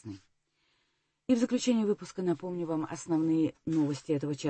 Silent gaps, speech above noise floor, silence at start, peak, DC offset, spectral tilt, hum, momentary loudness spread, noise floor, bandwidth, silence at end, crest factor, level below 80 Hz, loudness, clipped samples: none; 47 dB; 0.05 s; -14 dBFS; under 0.1%; -6 dB/octave; none; 7 LU; -77 dBFS; 8.8 kHz; 0 s; 16 dB; -70 dBFS; -31 LUFS; under 0.1%